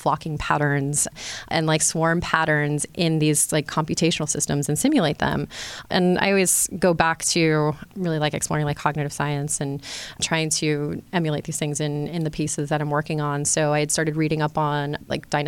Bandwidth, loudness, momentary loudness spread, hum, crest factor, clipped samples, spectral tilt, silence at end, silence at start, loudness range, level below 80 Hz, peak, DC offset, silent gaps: 16.5 kHz; -22 LUFS; 7 LU; none; 20 dB; under 0.1%; -4 dB/octave; 0 s; 0 s; 4 LU; -50 dBFS; -2 dBFS; under 0.1%; none